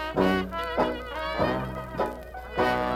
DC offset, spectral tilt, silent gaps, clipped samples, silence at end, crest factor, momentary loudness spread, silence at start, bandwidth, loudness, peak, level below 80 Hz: under 0.1%; -6.5 dB/octave; none; under 0.1%; 0 s; 18 dB; 8 LU; 0 s; 16 kHz; -28 LUFS; -10 dBFS; -44 dBFS